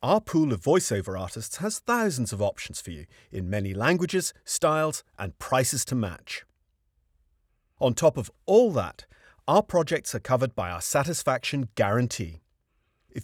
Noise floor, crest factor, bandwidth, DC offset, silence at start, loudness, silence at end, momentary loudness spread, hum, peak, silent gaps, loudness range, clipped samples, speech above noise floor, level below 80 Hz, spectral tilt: -72 dBFS; 20 dB; 19.5 kHz; under 0.1%; 0 s; -26 LUFS; 0 s; 14 LU; none; -6 dBFS; none; 4 LU; under 0.1%; 46 dB; -54 dBFS; -4.5 dB/octave